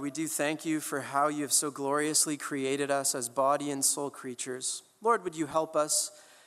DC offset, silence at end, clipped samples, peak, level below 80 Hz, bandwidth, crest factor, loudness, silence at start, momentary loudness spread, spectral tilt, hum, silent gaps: under 0.1%; 0.25 s; under 0.1%; -12 dBFS; -80 dBFS; 16 kHz; 20 dB; -29 LUFS; 0 s; 7 LU; -2.5 dB/octave; none; none